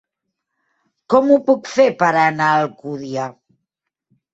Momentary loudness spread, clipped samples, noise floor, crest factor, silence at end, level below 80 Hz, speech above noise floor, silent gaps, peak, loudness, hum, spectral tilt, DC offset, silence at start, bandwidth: 12 LU; under 0.1%; -79 dBFS; 18 dB; 1 s; -64 dBFS; 64 dB; none; -2 dBFS; -16 LUFS; none; -6 dB/octave; under 0.1%; 1.1 s; 8 kHz